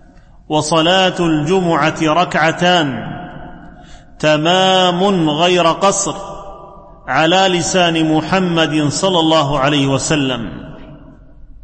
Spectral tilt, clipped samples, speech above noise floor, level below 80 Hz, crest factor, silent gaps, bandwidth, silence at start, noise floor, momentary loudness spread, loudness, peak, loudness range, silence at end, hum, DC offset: -4 dB/octave; under 0.1%; 25 dB; -40 dBFS; 14 dB; none; 8.8 kHz; 0.5 s; -38 dBFS; 16 LU; -13 LUFS; -2 dBFS; 2 LU; 0.05 s; none; under 0.1%